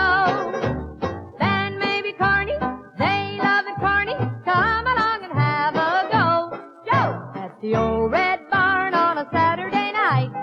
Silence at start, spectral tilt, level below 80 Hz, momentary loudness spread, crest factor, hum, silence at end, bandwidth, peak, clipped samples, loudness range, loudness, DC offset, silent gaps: 0 s; -7 dB/octave; -44 dBFS; 8 LU; 14 dB; none; 0 s; 7.4 kHz; -6 dBFS; under 0.1%; 2 LU; -21 LUFS; under 0.1%; none